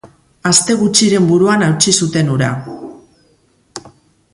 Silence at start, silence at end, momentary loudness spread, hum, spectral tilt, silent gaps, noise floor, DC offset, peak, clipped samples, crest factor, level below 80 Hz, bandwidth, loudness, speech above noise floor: 0.05 s; 0.45 s; 22 LU; none; -4 dB/octave; none; -55 dBFS; under 0.1%; 0 dBFS; under 0.1%; 14 dB; -52 dBFS; 11.5 kHz; -12 LUFS; 43 dB